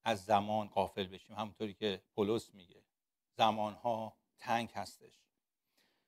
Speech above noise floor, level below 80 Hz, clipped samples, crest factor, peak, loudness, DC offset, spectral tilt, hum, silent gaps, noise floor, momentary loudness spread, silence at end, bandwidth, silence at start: 52 dB; -76 dBFS; under 0.1%; 24 dB; -14 dBFS; -37 LUFS; under 0.1%; -5 dB/octave; none; none; -89 dBFS; 15 LU; 1.1 s; 16 kHz; 0.05 s